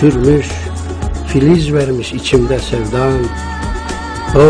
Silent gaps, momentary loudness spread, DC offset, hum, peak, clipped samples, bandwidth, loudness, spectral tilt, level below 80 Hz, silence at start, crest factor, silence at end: none; 11 LU; under 0.1%; none; 0 dBFS; under 0.1%; 10.5 kHz; -15 LUFS; -6.5 dB/octave; -24 dBFS; 0 s; 12 dB; 0 s